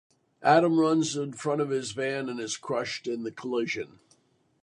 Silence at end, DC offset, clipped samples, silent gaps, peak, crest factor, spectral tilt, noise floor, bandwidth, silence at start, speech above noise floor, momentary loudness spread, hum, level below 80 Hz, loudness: 0.8 s; under 0.1%; under 0.1%; none; -6 dBFS; 22 dB; -4.5 dB/octave; -66 dBFS; 11 kHz; 0.4 s; 38 dB; 12 LU; none; -72 dBFS; -28 LUFS